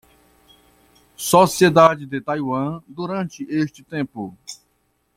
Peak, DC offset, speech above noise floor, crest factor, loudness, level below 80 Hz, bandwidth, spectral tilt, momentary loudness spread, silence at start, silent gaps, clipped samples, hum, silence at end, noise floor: 0 dBFS; under 0.1%; 48 dB; 20 dB; -19 LUFS; -58 dBFS; 16.5 kHz; -5 dB/octave; 19 LU; 1.2 s; none; under 0.1%; none; 0.65 s; -67 dBFS